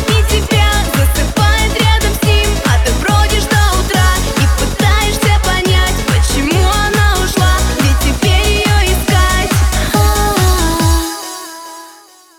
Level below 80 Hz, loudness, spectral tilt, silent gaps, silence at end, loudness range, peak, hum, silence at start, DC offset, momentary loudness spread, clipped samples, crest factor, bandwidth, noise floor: -16 dBFS; -12 LUFS; -4 dB/octave; none; 0.45 s; 0 LU; 0 dBFS; none; 0 s; under 0.1%; 2 LU; under 0.1%; 12 dB; 19 kHz; -40 dBFS